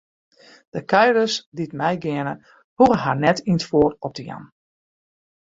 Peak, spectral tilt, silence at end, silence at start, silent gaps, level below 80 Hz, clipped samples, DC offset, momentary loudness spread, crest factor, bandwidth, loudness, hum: -2 dBFS; -5.5 dB/octave; 1.1 s; 0.75 s; 1.46-1.52 s, 2.64-2.77 s; -54 dBFS; under 0.1%; under 0.1%; 17 LU; 20 dB; 7.8 kHz; -20 LUFS; none